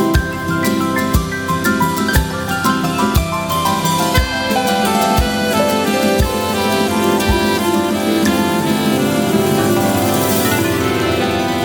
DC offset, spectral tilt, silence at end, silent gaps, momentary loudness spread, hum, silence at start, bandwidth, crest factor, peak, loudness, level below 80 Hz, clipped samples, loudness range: under 0.1%; -4.5 dB/octave; 0 s; none; 3 LU; none; 0 s; 19.5 kHz; 14 dB; -2 dBFS; -15 LUFS; -28 dBFS; under 0.1%; 1 LU